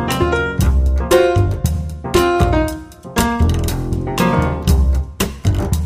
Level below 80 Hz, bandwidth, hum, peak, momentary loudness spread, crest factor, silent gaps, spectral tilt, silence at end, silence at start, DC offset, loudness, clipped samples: -20 dBFS; 15.5 kHz; none; 0 dBFS; 7 LU; 14 dB; none; -6 dB/octave; 0 s; 0 s; under 0.1%; -17 LUFS; under 0.1%